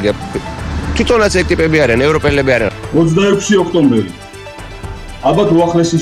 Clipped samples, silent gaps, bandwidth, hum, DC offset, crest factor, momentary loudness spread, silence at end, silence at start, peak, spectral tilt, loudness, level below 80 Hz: under 0.1%; none; 13.5 kHz; none; under 0.1%; 10 dB; 17 LU; 0 s; 0 s; -2 dBFS; -5.5 dB/octave; -12 LUFS; -28 dBFS